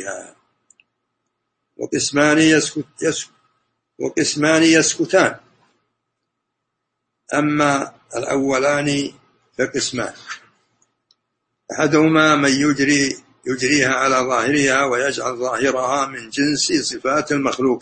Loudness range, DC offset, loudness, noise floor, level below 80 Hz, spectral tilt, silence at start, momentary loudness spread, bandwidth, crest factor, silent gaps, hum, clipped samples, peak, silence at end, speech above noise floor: 6 LU; under 0.1%; -17 LUFS; -77 dBFS; -58 dBFS; -3.5 dB/octave; 0 s; 14 LU; 8.8 kHz; 18 dB; none; none; under 0.1%; 0 dBFS; 0 s; 59 dB